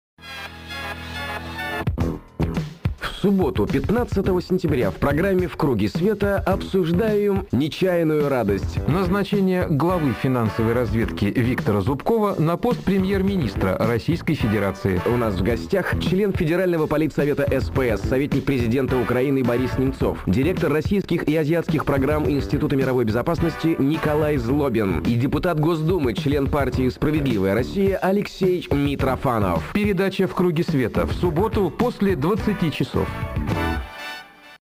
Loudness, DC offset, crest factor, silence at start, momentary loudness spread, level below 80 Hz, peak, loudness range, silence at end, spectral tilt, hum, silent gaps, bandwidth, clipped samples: -21 LUFS; under 0.1%; 12 dB; 0.2 s; 5 LU; -36 dBFS; -8 dBFS; 1 LU; 0.1 s; -7.5 dB/octave; none; none; 15.5 kHz; under 0.1%